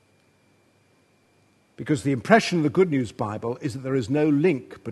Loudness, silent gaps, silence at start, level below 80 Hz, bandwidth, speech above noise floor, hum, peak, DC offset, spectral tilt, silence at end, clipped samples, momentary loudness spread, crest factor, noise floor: -23 LUFS; none; 1.8 s; -64 dBFS; 12.5 kHz; 39 dB; none; 0 dBFS; under 0.1%; -6.5 dB/octave; 0 s; under 0.1%; 11 LU; 24 dB; -62 dBFS